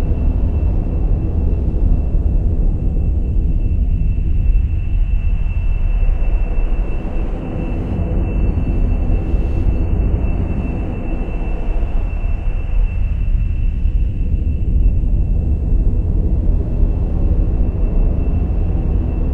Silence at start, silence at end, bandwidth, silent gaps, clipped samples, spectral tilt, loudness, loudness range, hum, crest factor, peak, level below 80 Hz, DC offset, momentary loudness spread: 0 s; 0 s; 3.1 kHz; none; under 0.1%; -10.5 dB/octave; -20 LUFS; 3 LU; none; 12 dB; -2 dBFS; -16 dBFS; under 0.1%; 4 LU